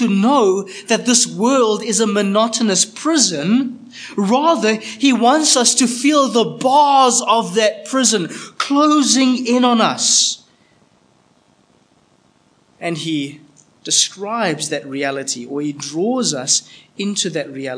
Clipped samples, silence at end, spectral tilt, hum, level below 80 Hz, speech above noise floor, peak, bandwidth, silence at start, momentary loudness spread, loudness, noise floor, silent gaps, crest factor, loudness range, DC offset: under 0.1%; 0 s; -2.5 dB/octave; none; -74 dBFS; 40 dB; 0 dBFS; 10.5 kHz; 0 s; 11 LU; -15 LUFS; -56 dBFS; none; 16 dB; 8 LU; under 0.1%